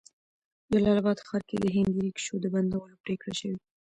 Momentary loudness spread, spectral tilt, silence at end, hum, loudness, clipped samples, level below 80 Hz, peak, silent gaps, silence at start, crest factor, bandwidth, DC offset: 11 LU; -6 dB/octave; 0.3 s; none; -29 LUFS; under 0.1%; -58 dBFS; -14 dBFS; 3.00-3.04 s; 0.7 s; 16 dB; 9.8 kHz; under 0.1%